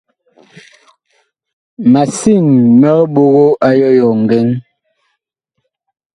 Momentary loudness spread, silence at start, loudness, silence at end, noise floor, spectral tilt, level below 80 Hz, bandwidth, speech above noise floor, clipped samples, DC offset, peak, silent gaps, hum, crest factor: 5 LU; 1.8 s; -10 LUFS; 1.55 s; -71 dBFS; -7.5 dB/octave; -52 dBFS; 11.5 kHz; 62 dB; under 0.1%; under 0.1%; 0 dBFS; none; none; 12 dB